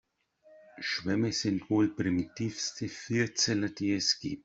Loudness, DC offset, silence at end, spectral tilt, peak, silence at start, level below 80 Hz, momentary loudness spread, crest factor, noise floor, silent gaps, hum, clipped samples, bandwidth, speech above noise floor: -30 LUFS; under 0.1%; 0.05 s; -4 dB/octave; -14 dBFS; 0.5 s; -66 dBFS; 7 LU; 16 dB; -63 dBFS; none; none; under 0.1%; 8 kHz; 32 dB